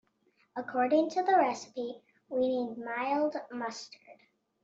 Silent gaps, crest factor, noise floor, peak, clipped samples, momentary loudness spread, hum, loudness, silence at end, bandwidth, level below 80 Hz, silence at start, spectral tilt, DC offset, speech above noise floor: none; 18 dB; -71 dBFS; -14 dBFS; under 0.1%; 16 LU; none; -31 LUFS; 0.5 s; 8 kHz; -80 dBFS; 0.55 s; -4 dB/octave; under 0.1%; 41 dB